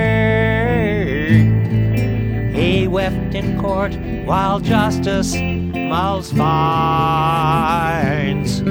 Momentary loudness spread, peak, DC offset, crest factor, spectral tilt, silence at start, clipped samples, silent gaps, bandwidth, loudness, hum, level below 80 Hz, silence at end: 5 LU; -2 dBFS; under 0.1%; 14 dB; -6.5 dB/octave; 0 s; under 0.1%; none; over 20 kHz; -17 LUFS; none; -30 dBFS; 0 s